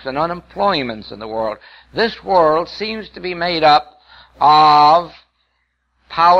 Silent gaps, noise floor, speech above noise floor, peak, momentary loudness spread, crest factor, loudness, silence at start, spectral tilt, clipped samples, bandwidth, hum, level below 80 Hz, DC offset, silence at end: none; -67 dBFS; 52 dB; -2 dBFS; 17 LU; 14 dB; -15 LUFS; 0.05 s; -5.5 dB/octave; under 0.1%; 7.8 kHz; none; -50 dBFS; under 0.1%; 0 s